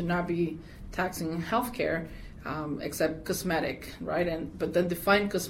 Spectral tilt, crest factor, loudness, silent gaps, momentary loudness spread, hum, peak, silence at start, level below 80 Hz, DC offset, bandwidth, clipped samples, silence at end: -5 dB/octave; 18 dB; -30 LUFS; none; 11 LU; none; -12 dBFS; 0 s; -50 dBFS; under 0.1%; 17.5 kHz; under 0.1%; 0 s